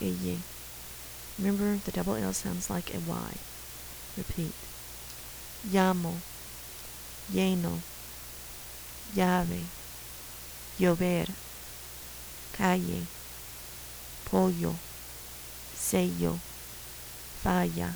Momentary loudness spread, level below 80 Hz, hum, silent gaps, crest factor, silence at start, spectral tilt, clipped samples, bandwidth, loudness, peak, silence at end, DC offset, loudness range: 14 LU; -50 dBFS; none; none; 24 dB; 0 s; -5 dB/octave; under 0.1%; over 20 kHz; -33 LUFS; -8 dBFS; 0 s; under 0.1%; 3 LU